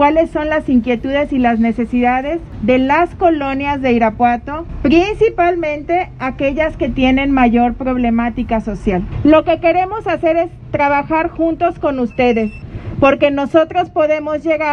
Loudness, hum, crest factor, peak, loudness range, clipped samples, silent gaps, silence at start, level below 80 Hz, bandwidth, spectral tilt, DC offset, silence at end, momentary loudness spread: -15 LUFS; none; 14 dB; 0 dBFS; 1 LU; under 0.1%; none; 0 s; -32 dBFS; 6.8 kHz; -7.5 dB/octave; under 0.1%; 0 s; 7 LU